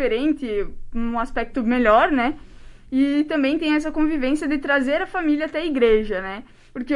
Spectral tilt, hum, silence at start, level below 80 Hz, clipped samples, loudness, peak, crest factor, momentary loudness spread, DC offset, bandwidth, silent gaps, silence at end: -5.5 dB/octave; none; 0 s; -38 dBFS; under 0.1%; -21 LUFS; -4 dBFS; 16 dB; 12 LU; under 0.1%; 11 kHz; none; 0 s